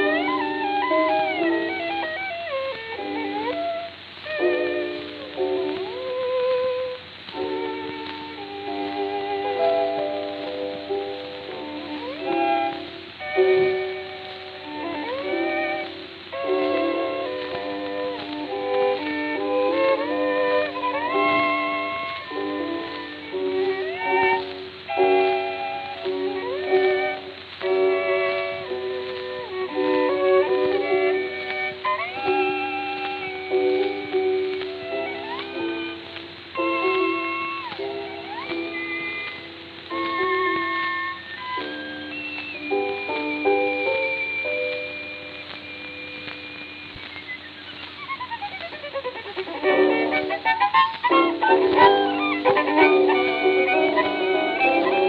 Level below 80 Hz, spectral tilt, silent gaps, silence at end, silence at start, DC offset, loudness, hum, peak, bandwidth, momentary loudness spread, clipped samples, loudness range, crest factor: -66 dBFS; -6.5 dB/octave; none; 0 s; 0 s; under 0.1%; -24 LUFS; none; -2 dBFS; 5.2 kHz; 14 LU; under 0.1%; 8 LU; 22 dB